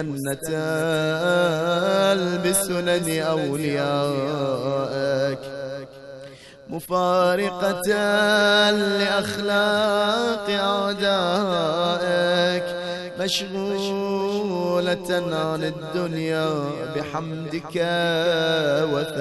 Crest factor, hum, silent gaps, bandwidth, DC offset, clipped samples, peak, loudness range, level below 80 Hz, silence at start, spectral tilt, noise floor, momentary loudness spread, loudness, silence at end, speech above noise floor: 16 dB; none; none; 12 kHz; under 0.1%; under 0.1%; -6 dBFS; 5 LU; -58 dBFS; 0 s; -4.5 dB/octave; -42 dBFS; 9 LU; -22 LUFS; 0 s; 20 dB